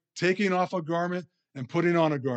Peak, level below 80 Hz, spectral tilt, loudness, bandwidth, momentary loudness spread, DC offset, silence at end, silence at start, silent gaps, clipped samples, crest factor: -12 dBFS; -82 dBFS; -6.5 dB/octave; -27 LUFS; 8.6 kHz; 12 LU; under 0.1%; 0 s; 0.15 s; none; under 0.1%; 16 dB